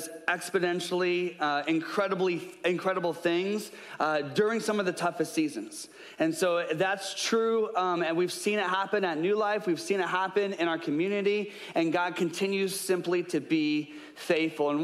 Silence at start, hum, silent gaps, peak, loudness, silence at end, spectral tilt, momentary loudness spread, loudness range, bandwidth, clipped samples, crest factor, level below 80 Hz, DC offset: 0 s; none; none; -14 dBFS; -29 LUFS; 0 s; -4.5 dB/octave; 4 LU; 2 LU; 15 kHz; under 0.1%; 16 dB; -82 dBFS; under 0.1%